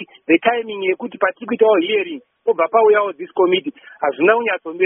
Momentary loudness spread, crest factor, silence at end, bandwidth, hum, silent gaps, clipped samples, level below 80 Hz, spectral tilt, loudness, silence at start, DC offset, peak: 9 LU; 16 dB; 0 s; 3.7 kHz; none; none; under 0.1%; -70 dBFS; 1 dB/octave; -17 LUFS; 0 s; under 0.1%; 0 dBFS